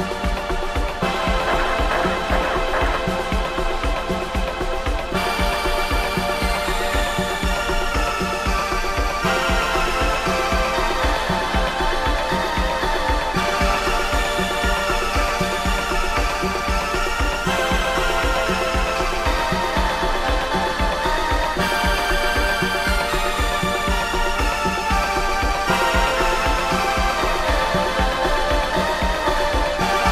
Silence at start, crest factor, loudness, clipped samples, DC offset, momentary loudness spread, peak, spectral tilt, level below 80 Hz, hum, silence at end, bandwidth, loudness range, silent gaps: 0 s; 16 dB; -20 LUFS; under 0.1%; under 0.1%; 3 LU; -4 dBFS; -4 dB/octave; -26 dBFS; none; 0 s; 15.5 kHz; 2 LU; none